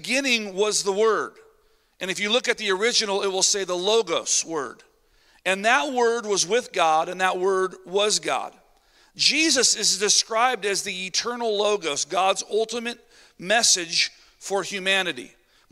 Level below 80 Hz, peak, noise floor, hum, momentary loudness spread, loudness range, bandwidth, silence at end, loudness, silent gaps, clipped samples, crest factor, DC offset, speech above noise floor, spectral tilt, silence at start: -68 dBFS; -4 dBFS; -62 dBFS; none; 11 LU; 3 LU; 16 kHz; 0.45 s; -22 LUFS; none; under 0.1%; 20 dB; under 0.1%; 39 dB; -1 dB/octave; 0 s